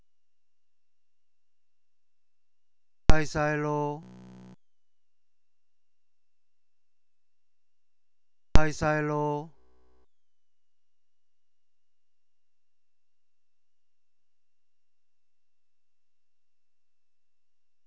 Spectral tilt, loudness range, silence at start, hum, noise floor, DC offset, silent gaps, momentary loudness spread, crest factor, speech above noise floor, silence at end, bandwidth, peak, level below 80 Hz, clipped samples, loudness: -6 dB/octave; 6 LU; 3.1 s; none; under -90 dBFS; under 0.1%; none; 17 LU; 28 dB; over 62 dB; 8.4 s; 8 kHz; -2 dBFS; -40 dBFS; under 0.1%; -29 LUFS